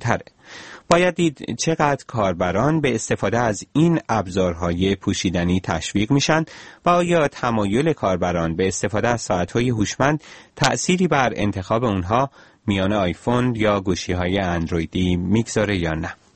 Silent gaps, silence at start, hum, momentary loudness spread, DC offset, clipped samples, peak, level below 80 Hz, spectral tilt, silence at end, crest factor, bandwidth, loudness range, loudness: none; 0 s; none; 6 LU; 0.2%; under 0.1%; 0 dBFS; -42 dBFS; -5.5 dB/octave; 0.2 s; 20 dB; 8.8 kHz; 1 LU; -21 LUFS